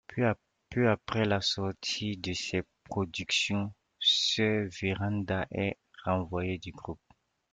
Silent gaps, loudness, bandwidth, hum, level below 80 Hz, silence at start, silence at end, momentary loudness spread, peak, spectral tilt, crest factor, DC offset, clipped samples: none; -31 LUFS; 9.4 kHz; none; -60 dBFS; 0.1 s; 0.55 s; 12 LU; -14 dBFS; -4.5 dB/octave; 18 dB; under 0.1%; under 0.1%